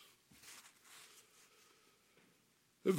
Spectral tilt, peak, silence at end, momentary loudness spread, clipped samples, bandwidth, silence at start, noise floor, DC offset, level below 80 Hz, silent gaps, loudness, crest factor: -6 dB/octave; -22 dBFS; 0 s; 13 LU; under 0.1%; 16.5 kHz; 0.45 s; -74 dBFS; under 0.1%; under -90 dBFS; none; -52 LUFS; 24 dB